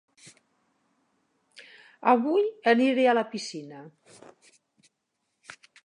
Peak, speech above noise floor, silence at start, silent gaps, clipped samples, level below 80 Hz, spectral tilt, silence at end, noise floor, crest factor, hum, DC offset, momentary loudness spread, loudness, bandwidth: -6 dBFS; 55 dB; 1.6 s; none; under 0.1%; -86 dBFS; -4.5 dB/octave; 1.95 s; -79 dBFS; 22 dB; none; under 0.1%; 23 LU; -24 LUFS; 11 kHz